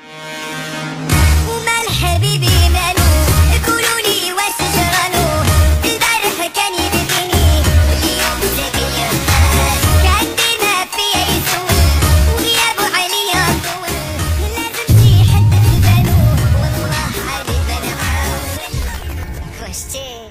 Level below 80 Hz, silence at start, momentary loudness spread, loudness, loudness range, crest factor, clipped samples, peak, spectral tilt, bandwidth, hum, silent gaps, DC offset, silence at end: -20 dBFS; 0.05 s; 11 LU; -14 LUFS; 2 LU; 14 dB; under 0.1%; 0 dBFS; -4 dB/octave; 16 kHz; none; none; under 0.1%; 0 s